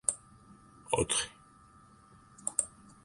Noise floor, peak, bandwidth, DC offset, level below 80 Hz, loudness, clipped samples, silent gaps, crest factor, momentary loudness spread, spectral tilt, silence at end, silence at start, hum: -59 dBFS; -12 dBFS; 12 kHz; under 0.1%; -58 dBFS; -34 LUFS; under 0.1%; none; 26 dB; 15 LU; -2 dB/octave; 0.35 s; 0.1 s; none